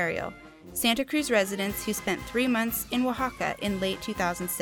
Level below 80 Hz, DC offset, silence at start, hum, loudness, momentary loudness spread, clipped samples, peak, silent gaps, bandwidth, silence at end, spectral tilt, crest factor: -52 dBFS; under 0.1%; 0 s; none; -28 LUFS; 5 LU; under 0.1%; -10 dBFS; none; 20 kHz; 0 s; -3.5 dB/octave; 18 dB